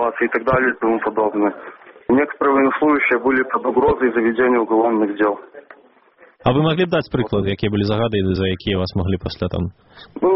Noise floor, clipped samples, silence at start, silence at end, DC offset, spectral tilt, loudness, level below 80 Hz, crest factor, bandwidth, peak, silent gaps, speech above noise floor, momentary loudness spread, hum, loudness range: -51 dBFS; under 0.1%; 0 s; 0 s; under 0.1%; -5 dB/octave; -18 LUFS; -44 dBFS; 16 dB; 5.8 kHz; -2 dBFS; none; 33 dB; 7 LU; none; 4 LU